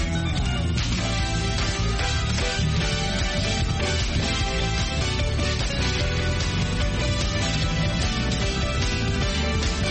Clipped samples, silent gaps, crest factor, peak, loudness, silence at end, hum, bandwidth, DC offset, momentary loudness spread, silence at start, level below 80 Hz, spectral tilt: under 0.1%; none; 12 dB; -12 dBFS; -24 LUFS; 0 s; none; 8.8 kHz; under 0.1%; 1 LU; 0 s; -28 dBFS; -4.5 dB/octave